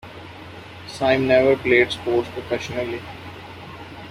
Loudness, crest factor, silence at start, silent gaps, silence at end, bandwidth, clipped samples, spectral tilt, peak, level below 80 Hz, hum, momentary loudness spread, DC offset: -20 LUFS; 20 dB; 0.05 s; none; 0 s; 14 kHz; under 0.1%; -5.5 dB/octave; -4 dBFS; -52 dBFS; none; 22 LU; under 0.1%